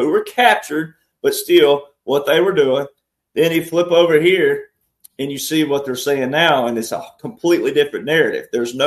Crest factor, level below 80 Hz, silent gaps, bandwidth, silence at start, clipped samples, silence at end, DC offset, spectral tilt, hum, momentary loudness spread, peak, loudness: 16 dB; -62 dBFS; none; 13.5 kHz; 0 s; under 0.1%; 0 s; under 0.1%; -4 dB/octave; none; 12 LU; 0 dBFS; -16 LUFS